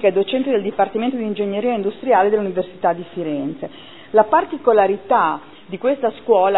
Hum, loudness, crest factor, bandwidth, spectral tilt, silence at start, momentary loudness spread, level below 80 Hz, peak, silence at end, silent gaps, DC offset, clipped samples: none; -19 LUFS; 18 dB; 4.1 kHz; -10 dB/octave; 0 s; 10 LU; -62 dBFS; 0 dBFS; 0 s; none; 0.5%; under 0.1%